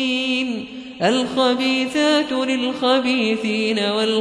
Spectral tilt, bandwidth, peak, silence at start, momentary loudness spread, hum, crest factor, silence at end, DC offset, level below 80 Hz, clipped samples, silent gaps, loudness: -4 dB/octave; 11 kHz; -4 dBFS; 0 s; 5 LU; none; 14 dB; 0 s; under 0.1%; -60 dBFS; under 0.1%; none; -19 LUFS